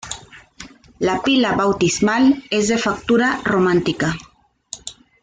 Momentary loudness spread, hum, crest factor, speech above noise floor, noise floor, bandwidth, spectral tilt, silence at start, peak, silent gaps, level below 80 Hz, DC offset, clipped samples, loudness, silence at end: 17 LU; none; 14 dB; 25 dB; -42 dBFS; 9.6 kHz; -4.5 dB/octave; 0.05 s; -6 dBFS; none; -48 dBFS; under 0.1%; under 0.1%; -17 LUFS; 0.3 s